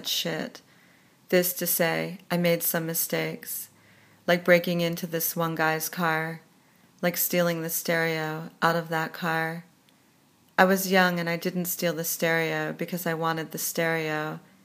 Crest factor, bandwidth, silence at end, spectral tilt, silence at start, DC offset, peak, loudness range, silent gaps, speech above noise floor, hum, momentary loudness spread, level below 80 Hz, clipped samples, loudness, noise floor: 26 dB; 15.5 kHz; 0.25 s; -4 dB/octave; 0 s; under 0.1%; -2 dBFS; 2 LU; none; 35 dB; none; 10 LU; -78 dBFS; under 0.1%; -26 LUFS; -61 dBFS